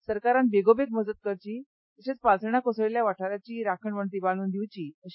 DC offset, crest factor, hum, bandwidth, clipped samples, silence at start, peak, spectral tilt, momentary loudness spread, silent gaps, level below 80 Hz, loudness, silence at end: under 0.1%; 18 dB; none; 5.8 kHz; under 0.1%; 0.1 s; -8 dBFS; -11 dB/octave; 14 LU; 1.66-1.96 s, 4.94-5.02 s; -64 dBFS; -27 LUFS; 0 s